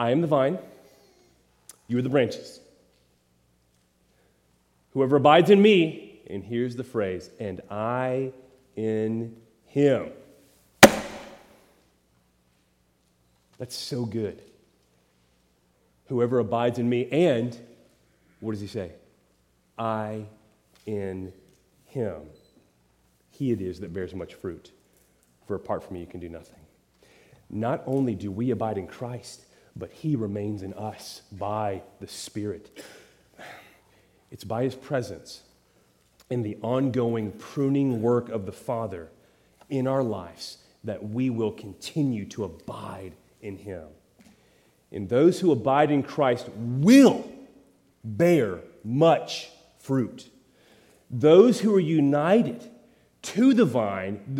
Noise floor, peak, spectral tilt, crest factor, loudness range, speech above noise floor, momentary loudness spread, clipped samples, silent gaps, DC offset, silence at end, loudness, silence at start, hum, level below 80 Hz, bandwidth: -67 dBFS; 0 dBFS; -6 dB/octave; 26 dB; 14 LU; 42 dB; 22 LU; under 0.1%; none; under 0.1%; 0 s; -25 LUFS; 0 s; none; -66 dBFS; 16.5 kHz